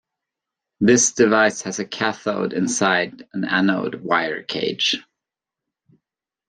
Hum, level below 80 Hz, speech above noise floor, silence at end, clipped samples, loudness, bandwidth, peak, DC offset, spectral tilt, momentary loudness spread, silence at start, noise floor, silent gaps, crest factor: none; -64 dBFS; 66 dB; 1.45 s; under 0.1%; -20 LUFS; 10.5 kHz; -2 dBFS; under 0.1%; -3 dB/octave; 11 LU; 0.8 s; -86 dBFS; none; 20 dB